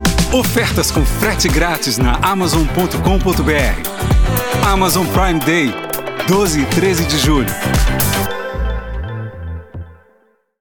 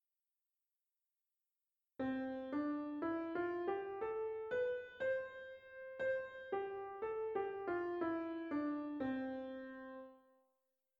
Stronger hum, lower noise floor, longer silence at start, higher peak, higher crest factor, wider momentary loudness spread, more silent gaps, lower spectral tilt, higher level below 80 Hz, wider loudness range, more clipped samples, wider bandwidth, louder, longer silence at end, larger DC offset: neither; second, -56 dBFS vs under -90 dBFS; second, 0 s vs 2 s; first, 0 dBFS vs -28 dBFS; about the same, 14 dB vs 16 dB; about the same, 11 LU vs 11 LU; neither; second, -4.5 dB/octave vs -7.5 dB/octave; first, -22 dBFS vs -78 dBFS; about the same, 3 LU vs 3 LU; neither; first, 19 kHz vs 7 kHz; first, -15 LUFS vs -43 LUFS; second, 0.65 s vs 0.8 s; neither